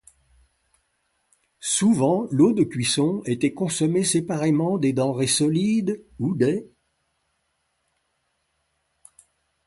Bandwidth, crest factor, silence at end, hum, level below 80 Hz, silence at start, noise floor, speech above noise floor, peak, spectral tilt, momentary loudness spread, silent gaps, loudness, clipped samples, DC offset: 12 kHz; 18 dB; 3 s; none; -62 dBFS; 1.6 s; -73 dBFS; 52 dB; -6 dBFS; -5 dB/octave; 6 LU; none; -22 LUFS; under 0.1%; under 0.1%